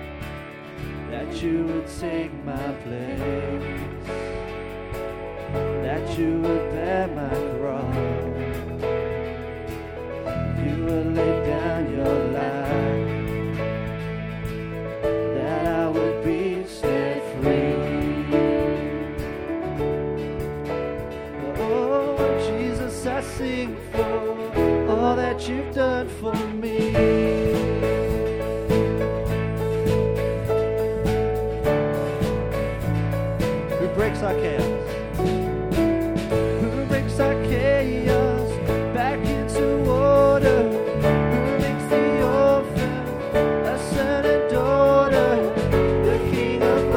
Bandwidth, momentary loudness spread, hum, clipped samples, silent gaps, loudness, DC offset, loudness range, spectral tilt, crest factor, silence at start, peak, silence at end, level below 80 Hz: 17.5 kHz; 11 LU; none; under 0.1%; none; -23 LUFS; under 0.1%; 8 LU; -7 dB/octave; 16 dB; 0 s; -6 dBFS; 0 s; -36 dBFS